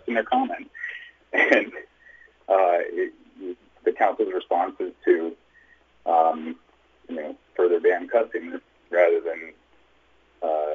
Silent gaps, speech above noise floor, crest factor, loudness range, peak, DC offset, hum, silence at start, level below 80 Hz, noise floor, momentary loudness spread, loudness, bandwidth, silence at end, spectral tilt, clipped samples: none; 37 dB; 20 dB; 2 LU; -6 dBFS; under 0.1%; none; 0.05 s; -70 dBFS; -60 dBFS; 18 LU; -24 LUFS; 7.2 kHz; 0 s; -4.5 dB/octave; under 0.1%